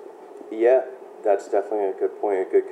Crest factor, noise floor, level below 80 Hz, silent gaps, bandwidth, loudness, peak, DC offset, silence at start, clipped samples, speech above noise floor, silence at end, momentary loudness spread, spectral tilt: 16 dB; -41 dBFS; under -90 dBFS; none; 9.2 kHz; -23 LUFS; -6 dBFS; under 0.1%; 0 s; under 0.1%; 19 dB; 0 s; 17 LU; -5 dB/octave